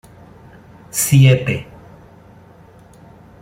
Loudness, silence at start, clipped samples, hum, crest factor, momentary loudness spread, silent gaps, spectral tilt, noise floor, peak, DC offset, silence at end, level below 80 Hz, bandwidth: -15 LUFS; 0.95 s; under 0.1%; none; 18 dB; 15 LU; none; -5 dB/octave; -44 dBFS; -2 dBFS; under 0.1%; 1.8 s; -48 dBFS; 16.5 kHz